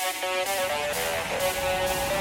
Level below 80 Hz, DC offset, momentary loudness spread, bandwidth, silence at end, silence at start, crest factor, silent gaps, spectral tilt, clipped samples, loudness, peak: -48 dBFS; under 0.1%; 1 LU; 17 kHz; 0 s; 0 s; 14 dB; none; -2 dB/octave; under 0.1%; -26 LUFS; -14 dBFS